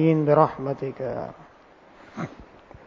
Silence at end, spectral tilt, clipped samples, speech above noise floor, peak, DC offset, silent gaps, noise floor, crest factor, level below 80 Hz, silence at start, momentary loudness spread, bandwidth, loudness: 0.45 s; -9.5 dB/octave; under 0.1%; 29 dB; -2 dBFS; under 0.1%; none; -52 dBFS; 22 dB; -58 dBFS; 0 s; 19 LU; 7 kHz; -24 LUFS